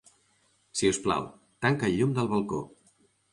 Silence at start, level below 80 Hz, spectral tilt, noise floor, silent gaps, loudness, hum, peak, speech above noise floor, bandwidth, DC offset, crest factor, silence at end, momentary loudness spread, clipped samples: 0.75 s; -58 dBFS; -5 dB/octave; -68 dBFS; none; -28 LUFS; none; -10 dBFS; 41 dB; 11.5 kHz; under 0.1%; 20 dB; 0.65 s; 10 LU; under 0.1%